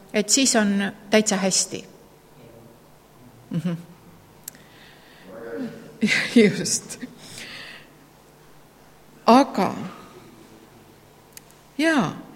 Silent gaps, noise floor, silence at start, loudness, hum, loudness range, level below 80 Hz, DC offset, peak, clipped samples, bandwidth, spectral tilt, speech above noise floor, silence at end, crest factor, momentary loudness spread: none; -51 dBFS; 0.15 s; -21 LUFS; none; 12 LU; -62 dBFS; under 0.1%; -2 dBFS; under 0.1%; 16.5 kHz; -3.5 dB/octave; 30 dB; 0 s; 24 dB; 23 LU